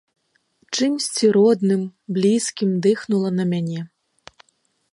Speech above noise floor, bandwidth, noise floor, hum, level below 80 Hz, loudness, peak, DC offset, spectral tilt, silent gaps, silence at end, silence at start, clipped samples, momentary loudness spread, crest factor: 48 dB; 11.5 kHz; -67 dBFS; none; -70 dBFS; -20 LUFS; -6 dBFS; under 0.1%; -5.5 dB/octave; none; 1.05 s; 0.7 s; under 0.1%; 11 LU; 16 dB